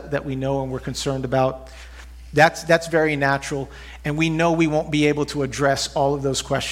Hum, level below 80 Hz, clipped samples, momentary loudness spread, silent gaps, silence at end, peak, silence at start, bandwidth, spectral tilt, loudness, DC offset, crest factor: none; -42 dBFS; under 0.1%; 12 LU; none; 0 s; 0 dBFS; 0 s; 16 kHz; -5 dB/octave; -21 LUFS; under 0.1%; 22 dB